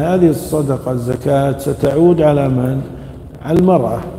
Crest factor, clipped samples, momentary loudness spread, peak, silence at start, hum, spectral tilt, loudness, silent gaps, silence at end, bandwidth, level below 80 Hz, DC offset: 14 dB; under 0.1%; 13 LU; 0 dBFS; 0 s; none; -8 dB/octave; -14 LUFS; none; 0 s; 16 kHz; -36 dBFS; under 0.1%